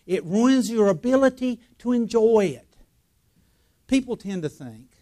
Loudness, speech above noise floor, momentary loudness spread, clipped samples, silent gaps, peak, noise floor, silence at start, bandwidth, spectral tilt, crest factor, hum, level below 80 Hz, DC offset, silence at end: -22 LUFS; 44 dB; 13 LU; under 0.1%; none; -6 dBFS; -65 dBFS; 0.1 s; 14 kHz; -6 dB/octave; 16 dB; none; -56 dBFS; under 0.1%; 0.25 s